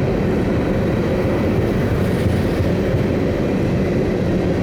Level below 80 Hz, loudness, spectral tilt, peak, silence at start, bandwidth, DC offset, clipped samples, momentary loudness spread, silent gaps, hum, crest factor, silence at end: -30 dBFS; -18 LUFS; -8 dB/octave; -6 dBFS; 0 s; over 20 kHz; under 0.1%; under 0.1%; 1 LU; none; none; 12 dB; 0 s